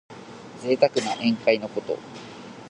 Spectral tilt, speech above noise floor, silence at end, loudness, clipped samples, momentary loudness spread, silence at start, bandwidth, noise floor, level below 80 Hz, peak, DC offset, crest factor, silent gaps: -4.5 dB/octave; 18 dB; 0 s; -24 LUFS; under 0.1%; 20 LU; 0.1 s; 11 kHz; -42 dBFS; -68 dBFS; -4 dBFS; under 0.1%; 22 dB; none